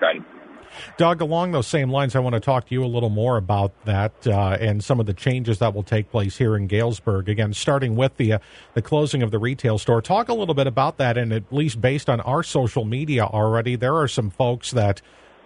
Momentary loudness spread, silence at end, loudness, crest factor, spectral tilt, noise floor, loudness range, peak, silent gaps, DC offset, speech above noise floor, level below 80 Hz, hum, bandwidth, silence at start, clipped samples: 4 LU; 0.45 s; -22 LUFS; 16 dB; -6.5 dB/octave; -43 dBFS; 1 LU; -6 dBFS; none; under 0.1%; 23 dB; -50 dBFS; none; 11 kHz; 0 s; under 0.1%